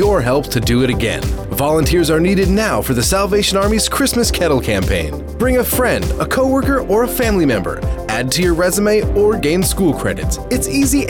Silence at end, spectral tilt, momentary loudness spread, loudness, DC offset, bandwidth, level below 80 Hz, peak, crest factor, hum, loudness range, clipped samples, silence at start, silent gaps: 0 s; -4.5 dB/octave; 6 LU; -15 LUFS; under 0.1%; over 20 kHz; -24 dBFS; -6 dBFS; 10 dB; none; 1 LU; under 0.1%; 0 s; none